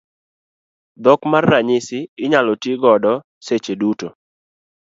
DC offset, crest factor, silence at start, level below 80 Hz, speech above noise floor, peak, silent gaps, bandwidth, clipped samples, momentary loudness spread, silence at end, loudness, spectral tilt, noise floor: under 0.1%; 18 dB; 1 s; -60 dBFS; over 74 dB; 0 dBFS; 2.09-2.17 s, 3.24-3.41 s; 7.8 kHz; under 0.1%; 10 LU; 0.75 s; -17 LUFS; -6 dB/octave; under -90 dBFS